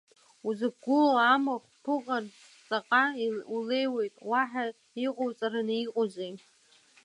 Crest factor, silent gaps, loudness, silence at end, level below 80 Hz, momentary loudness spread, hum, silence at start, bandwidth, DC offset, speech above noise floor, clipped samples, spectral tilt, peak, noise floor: 18 dB; none; -29 LUFS; 0.65 s; -86 dBFS; 12 LU; none; 0.45 s; 11 kHz; under 0.1%; 33 dB; under 0.1%; -5 dB/octave; -12 dBFS; -62 dBFS